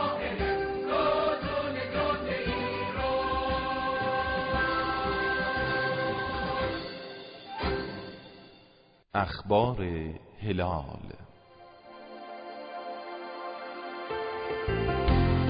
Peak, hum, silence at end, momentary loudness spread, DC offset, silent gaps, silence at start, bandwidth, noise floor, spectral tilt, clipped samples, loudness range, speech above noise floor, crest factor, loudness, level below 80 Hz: -12 dBFS; none; 0 s; 16 LU; under 0.1%; none; 0 s; 5.2 kHz; -60 dBFS; -10 dB/octave; under 0.1%; 9 LU; 30 dB; 18 dB; -30 LUFS; -42 dBFS